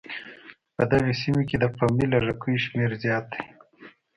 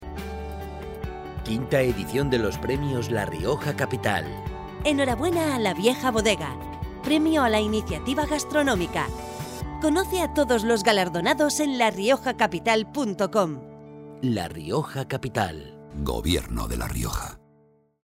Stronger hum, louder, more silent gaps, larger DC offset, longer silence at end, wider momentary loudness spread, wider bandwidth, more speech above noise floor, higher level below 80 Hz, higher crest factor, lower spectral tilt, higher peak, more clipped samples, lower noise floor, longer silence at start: neither; about the same, -24 LUFS vs -25 LUFS; neither; neither; second, 0.3 s vs 0.65 s; about the same, 15 LU vs 13 LU; second, 10.5 kHz vs 16 kHz; second, 27 dB vs 36 dB; second, -50 dBFS vs -40 dBFS; about the same, 18 dB vs 20 dB; first, -7.5 dB/octave vs -5 dB/octave; about the same, -6 dBFS vs -6 dBFS; neither; second, -51 dBFS vs -60 dBFS; about the same, 0.05 s vs 0 s